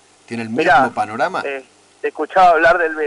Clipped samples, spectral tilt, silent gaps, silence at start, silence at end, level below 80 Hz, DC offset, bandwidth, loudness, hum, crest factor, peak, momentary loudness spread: under 0.1%; -5 dB/octave; none; 0.3 s; 0 s; -50 dBFS; under 0.1%; 11 kHz; -15 LUFS; 50 Hz at -65 dBFS; 12 dB; -4 dBFS; 16 LU